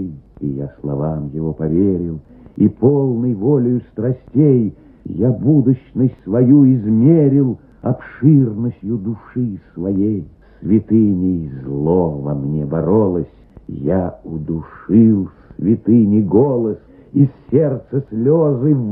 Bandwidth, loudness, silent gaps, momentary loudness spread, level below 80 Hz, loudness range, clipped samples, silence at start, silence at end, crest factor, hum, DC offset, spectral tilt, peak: 2.9 kHz; -16 LUFS; none; 13 LU; -44 dBFS; 5 LU; under 0.1%; 0 s; 0 s; 16 dB; none; under 0.1%; -15 dB/octave; 0 dBFS